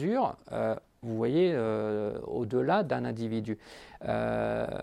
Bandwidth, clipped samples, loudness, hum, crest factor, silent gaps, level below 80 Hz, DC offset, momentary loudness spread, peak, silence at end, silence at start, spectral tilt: 11.5 kHz; under 0.1%; -31 LUFS; none; 16 dB; none; -58 dBFS; under 0.1%; 11 LU; -14 dBFS; 0 s; 0 s; -8 dB/octave